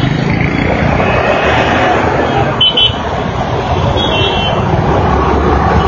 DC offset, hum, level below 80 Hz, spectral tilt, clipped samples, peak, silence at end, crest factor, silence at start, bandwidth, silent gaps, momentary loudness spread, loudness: under 0.1%; none; -22 dBFS; -6 dB/octave; under 0.1%; 0 dBFS; 0 s; 10 dB; 0 s; 7.2 kHz; none; 5 LU; -11 LUFS